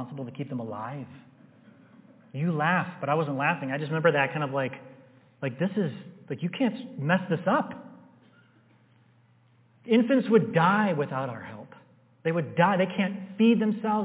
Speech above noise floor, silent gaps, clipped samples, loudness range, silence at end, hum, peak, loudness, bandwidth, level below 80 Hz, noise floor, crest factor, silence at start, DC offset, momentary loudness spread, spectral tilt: 35 dB; none; under 0.1%; 5 LU; 0 s; none; -8 dBFS; -27 LUFS; 4 kHz; -76 dBFS; -61 dBFS; 20 dB; 0 s; under 0.1%; 16 LU; -10.5 dB/octave